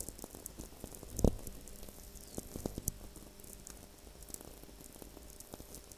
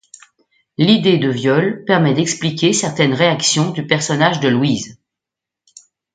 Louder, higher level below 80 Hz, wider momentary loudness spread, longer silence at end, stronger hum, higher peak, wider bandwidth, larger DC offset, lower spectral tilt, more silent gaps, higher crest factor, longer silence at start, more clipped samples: second, -44 LUFS vs -15 LUFS; first, -48 dBFS vs -58 dBFS; first, 18 LU vs 5 LU; second, 0 s vs 1.2 s; neither; second, -10 dBFS vs 0 dBFS; first, 16 kHz vs 9.4 kHz; neither; about the same, -5 dB/octave vs -4.5 dB/octave; neither; first, 34 dB vs 16 dB; second, 0 s vs 0.8 s; neither